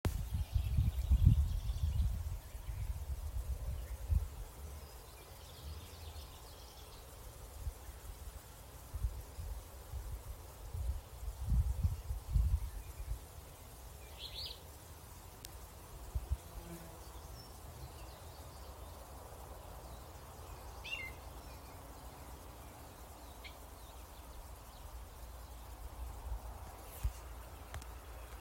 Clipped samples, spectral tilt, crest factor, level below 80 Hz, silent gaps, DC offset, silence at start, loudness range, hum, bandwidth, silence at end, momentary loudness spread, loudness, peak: under 0.1%; -5.5 dB/octave; 28 dB; -42 dBFS; none; under 0.1%; 0.05 s; 12 LU; none; 16 kHz; 0 s; 16 LU; -44 LUFS; -12 dBFS